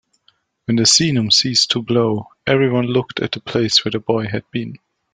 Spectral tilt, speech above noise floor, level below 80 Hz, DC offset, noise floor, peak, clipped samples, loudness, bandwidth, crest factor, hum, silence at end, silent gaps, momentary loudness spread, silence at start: -3.5 dB/octave; 43 dB; -54 dBFS; under 0.1%; -60 dBFS; 0 dBFS; under 0.1%; -16 LUFS; 10 kHz; 18 dB; none; 0.35 s; none; 12 LU; 0.7 s